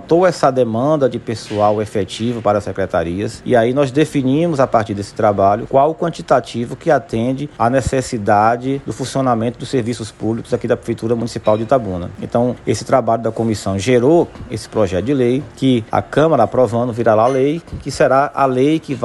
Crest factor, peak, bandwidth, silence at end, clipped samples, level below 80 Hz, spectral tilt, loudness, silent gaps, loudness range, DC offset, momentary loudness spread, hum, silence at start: 14 dB; -2 dBFS; 12 kHz; 0 s; under 0.1%; -44 dBFS; -6.5 dB/octave; -16 LUFS; none; 3 LU; under 0.1%; 8 LU; none; 0 s